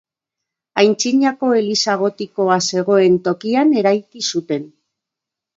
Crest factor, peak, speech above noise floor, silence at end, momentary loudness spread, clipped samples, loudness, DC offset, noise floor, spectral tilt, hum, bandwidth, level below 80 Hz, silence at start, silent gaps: 16 dB; 0 dBFS; 68 dB; 0.9 s; 8 LU; under 0.1%; -16 LUFS; under 0.1%; -84 dBFS; -4 dB/octave; none; 7.8 kHz; -68 dBFS; 0.75 s; none